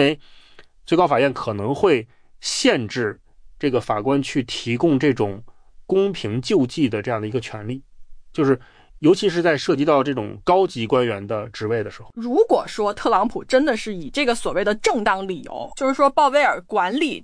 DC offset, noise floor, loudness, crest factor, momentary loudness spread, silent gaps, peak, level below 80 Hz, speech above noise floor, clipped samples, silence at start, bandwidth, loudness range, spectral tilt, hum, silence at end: under 0.1%; -46 dBFS; -20 LUFS; 16 dB; 9 LU; none; -4 dBFS; -48 dBFS; 27 dB; under 0.1%; 0 s; 10.5 kHz; 2 LU; -5 dB/octave; none; 0 s